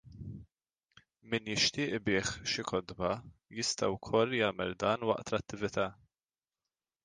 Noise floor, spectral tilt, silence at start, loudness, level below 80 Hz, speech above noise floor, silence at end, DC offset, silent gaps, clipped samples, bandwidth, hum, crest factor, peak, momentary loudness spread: under -90 dBFS; -3.5 dB/octave; 0.05 s; -33 LUFS; -60 dBFS; over 57 dB; 1.1 s; under 0.1%; none; under 0.1%; 10 kHz; none; 22 dB; -14 dBFS; 11 LU